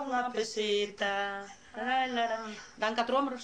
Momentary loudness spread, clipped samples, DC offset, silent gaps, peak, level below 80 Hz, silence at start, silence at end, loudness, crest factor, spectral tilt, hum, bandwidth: 9 LU; under 0.1%; under 0.1%; none; -16 dBFS; -70 dBFS; 0 s; 0 s; -32 LUFS; 18 dB; -2.5 dB/octave; none; 10 kHz